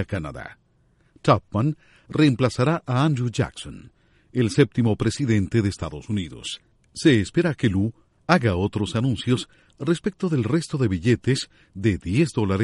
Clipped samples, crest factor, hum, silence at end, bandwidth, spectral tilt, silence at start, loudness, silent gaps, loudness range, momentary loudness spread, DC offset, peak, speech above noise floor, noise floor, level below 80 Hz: under 0.1%; 20 dB; none; 0 s; 11.5 kHz; -6.5 dB/octave; 0 s; -23 LUFS; none; 1 LU; 13 LU; under 0.1%; -4 dBFS; 39 dB; -62 dBFS; -48 dBFS